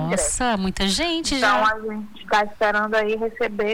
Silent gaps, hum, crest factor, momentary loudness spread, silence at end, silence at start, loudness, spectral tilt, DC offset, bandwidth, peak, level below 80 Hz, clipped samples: none; none; 14 dB; 6 LU; 0 s; 0 s; -21 LUFS; -3 dB/octave; under 0.1%; 19 kHz; -8 dBFS; -40 dBFS; under 0.1%